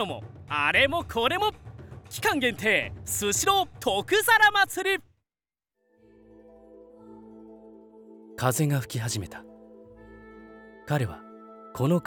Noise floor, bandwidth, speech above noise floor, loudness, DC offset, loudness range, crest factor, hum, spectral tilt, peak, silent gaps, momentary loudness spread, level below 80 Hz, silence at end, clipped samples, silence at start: under -90 dBFS; over 20 kHz; over 65 dB; -25 LUFS; under 0.1%; 10 LU; 20 dB; none; -3.5 dB/octave; -8 dBFS; none; 23 LU; -56 dBFS; 0.05 s; under 0.1%; 0 s